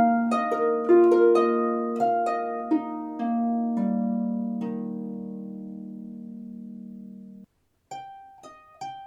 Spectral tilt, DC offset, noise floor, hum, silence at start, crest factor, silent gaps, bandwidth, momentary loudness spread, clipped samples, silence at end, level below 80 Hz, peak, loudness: -8 dB/octave; under 0.1%; -57 dBFS; none; 0 s; 16 dB; none; 9.4 kHz; 22 LU; under 0.1%; 0 s; -76 dBFS; -8 dBFS; -24 LUFS